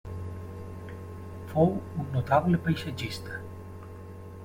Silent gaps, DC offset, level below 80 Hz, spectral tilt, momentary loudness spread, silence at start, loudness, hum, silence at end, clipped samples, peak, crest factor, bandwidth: none; under 0.1%; -54 dBFS; -7.5 dB/octave; 19 LU; 0.05 s; -29 LUFS; none; 0 s; under 0.1%; -8 dBFS; 22 dB; 16.5 kHz